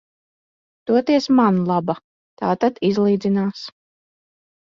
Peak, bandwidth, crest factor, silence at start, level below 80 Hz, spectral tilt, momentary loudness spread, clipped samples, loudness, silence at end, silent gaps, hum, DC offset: -4 dBFS; 7.4 kHz; 16 dB; 0.85 s; -62 dBFS; -7.5 dB/octave; 14 LU; under 0.1%; -19 LUFS; 1.1 s; 2.04-2.37 s; none; under 0.1%